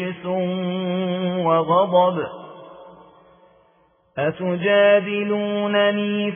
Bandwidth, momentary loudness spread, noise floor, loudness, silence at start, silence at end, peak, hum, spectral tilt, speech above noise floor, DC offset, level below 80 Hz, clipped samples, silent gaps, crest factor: 3.6 kHz; 13 LU; -59 dBFS; -20 LUFS; 0 s; 0 s; -6 dBFS; none; -10 dB/octave; 40 dB; under 0.1%; -68 dBFS; under 0.1%; none; 16 dB